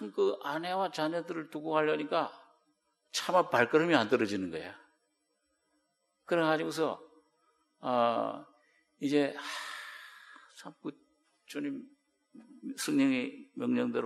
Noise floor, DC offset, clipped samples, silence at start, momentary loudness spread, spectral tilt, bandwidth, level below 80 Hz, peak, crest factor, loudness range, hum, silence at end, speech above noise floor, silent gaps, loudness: -78 dBFS; under 0.1%; under 0.1%; 0 s; 18 LU; -4.5 dB/octave; 13 kHz; -82 dBFS; -8 dBFS; 24 dB; 8 LU; none; 0 s; 47 dB; none; -32 LUFS